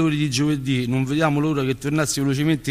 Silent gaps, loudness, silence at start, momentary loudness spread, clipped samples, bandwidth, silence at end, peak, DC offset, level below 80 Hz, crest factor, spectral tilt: none; -21 LUFS; 0 s; 2 LU; under 0.1%; 15.5 kHz; 0 s; -6 dBFS; under 0.1%; -48 dBFS; 14 dB; -5.5 dB/octave